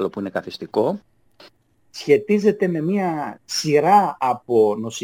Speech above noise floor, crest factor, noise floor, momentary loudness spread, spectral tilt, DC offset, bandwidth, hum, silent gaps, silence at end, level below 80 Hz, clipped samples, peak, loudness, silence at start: 35 dB; 18 dB; -54 dBFS; 12 LU; -5.5 dB/octave; under 0.1%; 17.5 kHz; none; none; 0 s; -66 dBFS; under 0.1%; -4 dBFS; -20 LUFS; 0 s